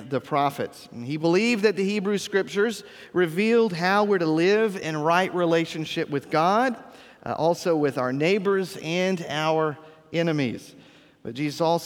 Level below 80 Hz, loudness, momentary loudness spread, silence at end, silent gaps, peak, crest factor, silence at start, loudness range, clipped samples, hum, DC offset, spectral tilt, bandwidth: -70 dBFS; -24 LUFS; 12 LU; 0 s; none; -6 dBFS; 18 dB; 0 s; 3 LU; under 0.1%; none; under 0.1%; -5.5 dB/octave; 17.5 kHz